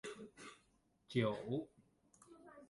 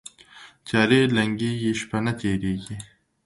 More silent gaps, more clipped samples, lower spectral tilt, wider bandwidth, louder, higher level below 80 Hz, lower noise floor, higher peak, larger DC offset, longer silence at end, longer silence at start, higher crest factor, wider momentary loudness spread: neither; neither; about the same, -6.5 dB/octave vs -5.5 dB/octave; about the same, 11.5 kHz vs 11.5 kHz; second, -42 LUFS vs -23 LUFS; second, -78 dBFS vs -52 dBFS; first, -76 dBFS vs -49 dBFS; second, -22 dBFS vs -4 dBFS; neither; second, 0.05 s vs 0.4 s; second, 0.05 s vs 0.35 s; about the same, 24 dB vs 20 dB; first, 23 LU vs 19 LU